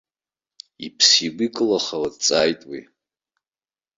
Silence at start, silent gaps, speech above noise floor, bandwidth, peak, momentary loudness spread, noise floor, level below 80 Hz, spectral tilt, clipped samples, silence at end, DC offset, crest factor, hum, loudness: 0.8 s; none; over 69 dB; 7.8 kHz; -2 dBFS; 22 LU; under -90 dBFS; -62 dBFS; -1.5 dB/octave; under 0.1%; 1.15 s; under 0.1%; 22 dB; none; -18 LUFS